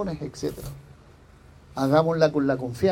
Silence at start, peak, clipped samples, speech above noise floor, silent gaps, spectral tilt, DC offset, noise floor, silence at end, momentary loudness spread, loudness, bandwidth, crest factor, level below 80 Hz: 0 s; -6 dBFS; under 0.1%; 27 dB; none; -7 dB/octave; under 0.1%; -51 dBFS; 0 s; 18 LU; -24 LUFS; 16.5 kHz; 20 dB; -50 dBFS